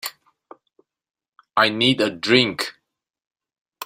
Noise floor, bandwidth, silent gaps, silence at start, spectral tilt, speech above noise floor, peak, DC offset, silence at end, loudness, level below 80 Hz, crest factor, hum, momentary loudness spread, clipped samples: -64 dBFS; 16 kHz; 3.27-3.31 s, 3.61-3.65 s; 0.05 s; -4 dB/octave; 45 dB; -2 dBFS; under 0.1%; 0 s; -19 LUFS; -64 dBFS; 22 dB; none; 12 LU; under 0.1%